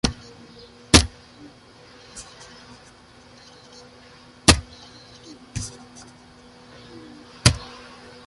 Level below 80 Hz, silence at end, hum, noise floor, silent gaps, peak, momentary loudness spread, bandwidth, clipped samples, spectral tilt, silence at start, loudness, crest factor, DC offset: -36 dBFS; 0.6 s; none; -49 dBFS; none; 0 dBFS; 29 LU; 16 kHz; under 0.1%; -3 dB/octave; 0.05 s; -20 LUFS; 26 dB; under 0.1%